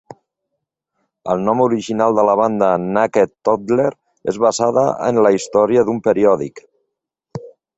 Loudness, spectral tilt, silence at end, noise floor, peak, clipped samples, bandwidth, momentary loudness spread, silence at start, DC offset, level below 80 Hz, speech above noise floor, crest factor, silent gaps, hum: -16 LUFS; -6 dB/octave; 0.25 s; -77 dBFS; -2 dBFS; under 0.1%; 8.2 kHz; 13 LU; 1.25 s; under 0.1%; -58 dBFS; 62 dB; 16 dB; none; none